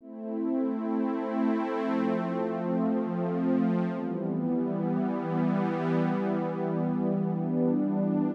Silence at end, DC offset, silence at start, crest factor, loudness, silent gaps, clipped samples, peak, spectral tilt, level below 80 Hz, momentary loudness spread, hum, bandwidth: 0 s; under 0.1%; 0 s; 12 dB; -29 LUFS; none; under 0.1%; -16 dBFS; -10 dB/octave; under -90 dBFS; 4 LU; none; 5.8 kHz